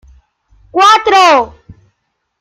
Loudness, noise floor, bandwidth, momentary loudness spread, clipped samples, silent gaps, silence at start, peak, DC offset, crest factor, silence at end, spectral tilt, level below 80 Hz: -8 LUFS; -67 dBFS; 15.5 kHz; 13 LU; under 0.1%; none; 0.75 s; 0 dBFS; under 0.1%; 12 dB; 0.95 s; -2 dB/octave; -46 dBFS